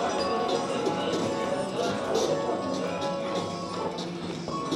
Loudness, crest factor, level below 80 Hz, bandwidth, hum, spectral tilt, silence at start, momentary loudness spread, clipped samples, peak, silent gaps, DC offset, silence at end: -29 LUFS; 16 dB; -62 dBFS; 14 kHz; none; -4.5 dB/octave; 0 s; 6 LU; under 0.1%; -14 dBFS; none; under 0.1%; 0 s